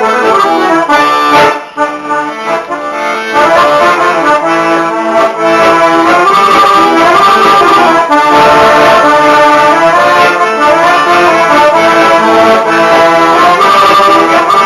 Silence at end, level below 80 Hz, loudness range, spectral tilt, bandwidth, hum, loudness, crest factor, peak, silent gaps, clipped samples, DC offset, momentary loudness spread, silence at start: 0 s; -44 dBFS; 4 LU; -3.5 dB/octave; 13.5 kHz; none; -6 LUFS; 6 dB; 0 dBFS; none; 0.6%; under 0.1%; 8 LU; 0 s